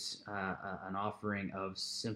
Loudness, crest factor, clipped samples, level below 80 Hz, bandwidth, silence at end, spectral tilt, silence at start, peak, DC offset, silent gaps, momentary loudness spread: -40 LUFS; 18 dB; under 0.1%; -72 dBFS; 15.5 kHz; 0 s; -4 dB/octave; 0 s; -22 dBFS; under 0.1%; none; 3 LU